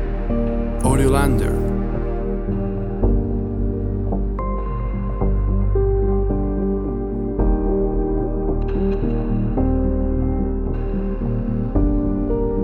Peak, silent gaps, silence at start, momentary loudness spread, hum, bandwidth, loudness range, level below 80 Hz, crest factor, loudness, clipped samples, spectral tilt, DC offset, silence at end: -4 dBFS; none; 0 s; 5 LU; none; 12.5 kHz; 2 LU; -22 dBFS; 16 dB; -22 LUFS; under 0.1%; -8.5 dB/octave; under 0.1%; 0 s